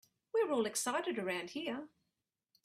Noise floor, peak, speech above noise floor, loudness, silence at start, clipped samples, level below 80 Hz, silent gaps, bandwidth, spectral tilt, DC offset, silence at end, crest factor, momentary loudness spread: -88 dBFS; -22 dBFS; 51 dB; -37 LUFS; 0.35 s; under 0.1%; -84 dBFS; none; 15.5 kHz; -2.5 dB/octave; under 0.1%; 0.8 s; 16 dB; 9 LU